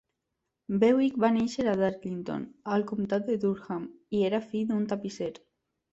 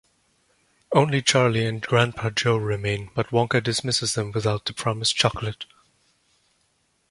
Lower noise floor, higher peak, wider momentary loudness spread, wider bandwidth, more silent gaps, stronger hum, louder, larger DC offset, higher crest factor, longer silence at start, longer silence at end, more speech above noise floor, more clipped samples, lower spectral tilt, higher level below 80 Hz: first, -84 dBFS vs -68 dBFS; second, -10 dBFS vs -2 dBFS; first, 12 LU vs 8 LU; second, 8 kHz vs 11.5 kHz; neither; neither; second, -29 LUFS vs -23 LUFS; neither; about the same, 18 dB vs 22 dB; second, 0.7 s vs 0.9 s; second, 0.6 s vs 1.45 s; first, 55 dB vs 45 dB; neither; first, -7 dB/octave vs -4 dB/octave; second, -66 dBFS vs -52 dBFS